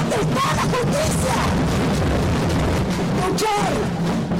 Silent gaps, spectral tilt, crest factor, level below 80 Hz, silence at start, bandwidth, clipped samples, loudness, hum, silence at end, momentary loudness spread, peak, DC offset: none; -5.5 dB/octave; 10 dB; -32 dBFS; 0 s; 16 kHz; under 0.1%; -20 LUFS; none; 0 s; 2 LU; -10 dBFS; under 0.1%